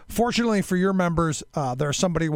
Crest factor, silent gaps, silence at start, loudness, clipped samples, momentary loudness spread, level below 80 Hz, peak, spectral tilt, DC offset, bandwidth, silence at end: 16 dB; none; 0 s; -23 LUFS; under 0.1%; 4 LU; -44 dBFS; -8 dBFS; -5 dB/octave; under 0.1%; 18 kHz; 0 s